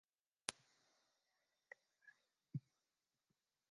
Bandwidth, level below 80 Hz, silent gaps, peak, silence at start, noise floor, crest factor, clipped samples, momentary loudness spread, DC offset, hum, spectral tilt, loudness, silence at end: 9 kHz; under -90 dBFS; none; -16 dBFS; 0.5 s; under -90 dBFS; 44 dB; under 0.1%; 14 LU; under 0.1%; none; -3 dB/octave; -52 LUFS; 1.1 s